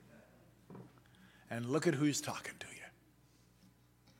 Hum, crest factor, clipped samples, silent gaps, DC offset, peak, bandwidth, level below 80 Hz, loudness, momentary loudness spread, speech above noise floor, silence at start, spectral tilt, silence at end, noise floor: 60 Hz at -65 dBFS; 24 dB; under 0.1%; none; under 0.1%; -18 dBFS; 17 kHz; -76 dBFS; -37 LUFS; 23 LU; 31 dB; 0.1 s; -4.5 dB/octave; 1.3 s; -67 dBFS